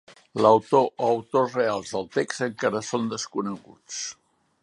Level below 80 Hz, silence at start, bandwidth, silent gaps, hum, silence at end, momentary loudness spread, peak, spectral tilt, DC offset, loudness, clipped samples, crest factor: -68 dBFS; 0.35 s; 11.5 kHz; none; none; 0.5 s; 14 LU; -4 dBFS; -4.5 dB/octave; under 0.1%; -24 LUFS; under 0.1%; 22 dB